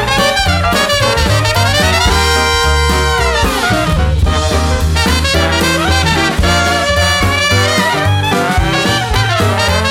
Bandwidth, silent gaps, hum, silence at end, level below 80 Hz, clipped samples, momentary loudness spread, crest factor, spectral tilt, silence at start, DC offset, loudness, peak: 16.5 kHz; none; none; 0 s; -20 dBFS; under 0.1%; 2 LU; 12 dB; -4 dB/octave; 0 s; under 0.1%; -11 LUFS; 0 dBFS